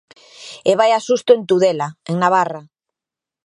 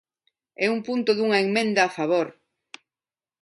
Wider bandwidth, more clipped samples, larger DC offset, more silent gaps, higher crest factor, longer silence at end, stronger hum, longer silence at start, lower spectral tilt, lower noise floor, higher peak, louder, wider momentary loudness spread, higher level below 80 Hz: about the same, 11 kHz vs 11.5 kHz; neither; neither; neither; about the same, 18 dB vs 18 dB; second, 0.85 s vs 1.1 s; neither; second, 0.4 s vs 0.6 s; about the same, -5 dB/octave vs -4.5 dB/octave; about the same, -87 dBFS vs under -90 dBFS; first, 0 dBFS vs -6 dBFS; first, -16 LUFS vs -23 LUFS; first, 16 LU vs 5 LU; first, -70 dBFS vs -76 dBFS